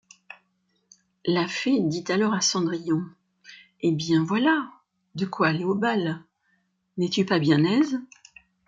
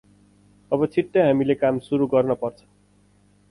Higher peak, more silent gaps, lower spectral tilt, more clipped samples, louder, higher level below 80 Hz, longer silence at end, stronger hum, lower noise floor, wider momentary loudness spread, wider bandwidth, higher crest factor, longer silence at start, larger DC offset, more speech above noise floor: about the same, -8 dBFS vs -6 dBFS; neither; second, -5 dB/octave vs -8.5 dB/octave; neither; about the same, -24 LUFS vs -22 LUFS; second, -68 dBFS vs -60 dBFS; second, 0.6 s vs 1 s; second, none vs 50 Hz at -50 dBFS; first, -71 dBFS vs -58 dBFS; first, 11 LU vs 8 LU; second, 7.8 kHz vs 11 kHz; about the same, 18 dB vs 16 dB; first, 1.25 s vs 0.7 s; neither; first, 48 dB vs 37 dB